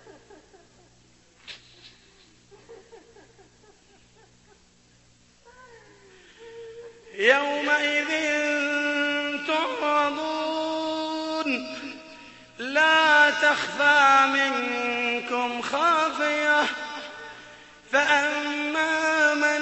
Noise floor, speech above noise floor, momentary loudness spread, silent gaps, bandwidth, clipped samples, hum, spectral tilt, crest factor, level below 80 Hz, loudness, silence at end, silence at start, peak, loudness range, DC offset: -59 dBFS; 36 dB; 23 LU; none; 8.4 kHz; under 0.1%; none; -1.5 dB/octave; 20 dB; -68 dBFS; -22 LUFS; 0 s; 0.05 s; -6 dBFS; 7 LU; under 0.1%